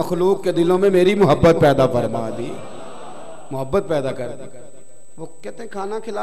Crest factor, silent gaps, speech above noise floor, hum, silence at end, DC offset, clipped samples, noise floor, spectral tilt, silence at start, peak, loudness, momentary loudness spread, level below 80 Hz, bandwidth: 14 dB; none; 30 dB; none; 0 s; 3%; under 0.1%; -48 dBFS; -7 dB/octave; 0 s; -6 dBFS; -18 LUFS; 23 LU; -44 dBFS; 14 kHz